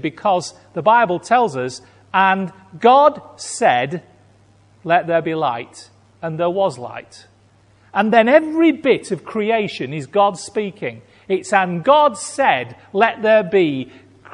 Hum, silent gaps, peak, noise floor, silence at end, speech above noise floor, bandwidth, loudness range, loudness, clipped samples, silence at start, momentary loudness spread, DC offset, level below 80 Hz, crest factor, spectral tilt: none; none; 0 dBFS; -53 dBFS; 0.45 s; 36 dB; 11 kHz; 5 LU; -17 LUFS; under 0.1%; 0.05 s; 16 LU; under 0.1%; -64 dBFS; 18 dB; -5 dB/octave